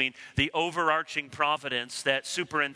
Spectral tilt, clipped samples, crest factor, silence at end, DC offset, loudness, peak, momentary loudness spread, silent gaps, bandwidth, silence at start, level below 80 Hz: -3 dB/octave; under 0.1%; 20 dB; 0 s; under 0.1%; -28 LUFS; -10 dBFS; 4 LU; none; 11 kHz; 0 s; -56 dBFS